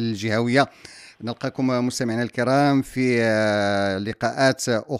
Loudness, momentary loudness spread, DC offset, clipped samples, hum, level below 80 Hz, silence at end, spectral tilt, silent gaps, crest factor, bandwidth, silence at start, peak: -22 LUFS; 10 LU; under 0.1%; under 0.1%; none; -58 dBFS; 0 s; -5.5 dB/octave; none; 18 dB; 15 kHz; 0 s; -4 dBFS